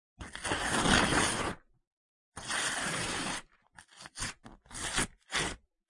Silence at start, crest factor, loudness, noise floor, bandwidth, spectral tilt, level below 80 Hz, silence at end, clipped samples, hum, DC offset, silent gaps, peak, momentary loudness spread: 0.2 s; 26 dB; -32 LUFS; -59 dBFS; 11.5 kHz; -2.5 dB/octave; -50 dBFS; 0.35 s; under 0.1%; none; under 0.1%; 1.87-2.32 s; -10 dBFS; 20 LU